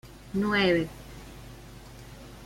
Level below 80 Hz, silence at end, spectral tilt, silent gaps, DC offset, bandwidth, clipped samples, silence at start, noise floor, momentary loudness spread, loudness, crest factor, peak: -50 dBFS; 0 s; -5.5 dB/octave; none; under 0.1%; 16.5 kHz; under 0.1%; 0.05 s; -46 dBFS; 23 LU; -27 LUFS; 20 dB; -12 dBFS